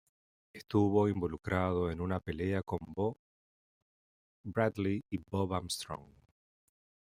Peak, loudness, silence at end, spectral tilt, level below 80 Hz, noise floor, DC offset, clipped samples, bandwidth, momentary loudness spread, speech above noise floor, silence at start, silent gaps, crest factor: -14 dBFS; -34 LUFS; 1.1 s; -6.5 dB/octave; -62 dBFS; under -90 dBFS; under 0.1%; under 0.1%; 16 kHz; 10 LU; over 56 dB; 0.55 s; 3.19-4.44 s; 22 dB